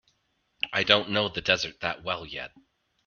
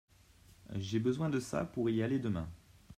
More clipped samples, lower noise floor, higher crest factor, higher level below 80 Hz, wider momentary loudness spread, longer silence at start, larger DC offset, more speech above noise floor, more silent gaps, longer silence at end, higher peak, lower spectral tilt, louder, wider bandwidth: neither; first, -73 dBFS vs -62 dBFS; first, 28 dB vs 16 dB; about the same, -60 dBFS vs -60 dBFS; first, 15 LU vs 9 LU; first, 0.65 s vs 0.5 s; neither; first, 46 dB vs 28 dB; neither; first, 0.6 s vs 0.05 s; first, -2 dBFS vs -20 dBFS; second, -0.5 dB/octave vs -7 dB/octave; first, -26 LUFS vs -36 LUFS; second, 7.2 kHz vs 14.5 kHz